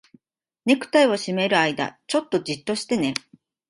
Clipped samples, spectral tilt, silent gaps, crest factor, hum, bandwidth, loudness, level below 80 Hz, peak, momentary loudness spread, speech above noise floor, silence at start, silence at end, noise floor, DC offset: under 0.1%; -4 dB/octave; none; 20 dB; none; 11.5 kHz; -22 LUFS; -66 dBFS; -4 dBFS; 9 LU; 53 dB; 0.65 s; 0.5 s; -74 dBFS; under 0.1%